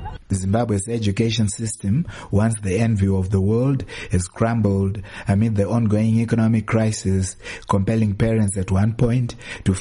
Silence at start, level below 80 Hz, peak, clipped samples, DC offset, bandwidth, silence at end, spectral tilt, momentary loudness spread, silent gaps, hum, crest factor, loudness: 0 s; -40 dBFS; -6 dBFS; under 0.1%; under 0.1%; 11.5 kHz; 0 s; -6.5 dB/octave; 6 LU; none; none; 14 dB; -21 LUFS